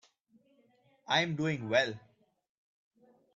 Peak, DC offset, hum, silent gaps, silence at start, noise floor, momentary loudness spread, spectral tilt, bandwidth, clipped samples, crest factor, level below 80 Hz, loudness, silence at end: -14 dBFS; under 0.1%; none; none; 1.1 s; -69 dBFS; 7 LU; -4.5 dB/octave; 8 kHz; under 0.1%; 22 dB; -74 dBFS; -31 LUFS; 1.35 s